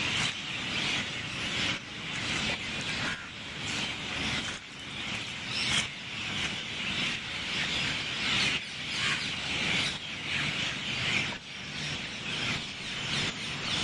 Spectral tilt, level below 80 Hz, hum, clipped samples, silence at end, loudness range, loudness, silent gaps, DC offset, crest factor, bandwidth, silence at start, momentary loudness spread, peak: -2 dB/octave; -56 dBFS; none; under 0.1%; 0 s; 3 LU; -31 LUFS; none; under 0.1%; 18 dB; 11.5 kHz; 0 s; 7 LU; -14 dBFS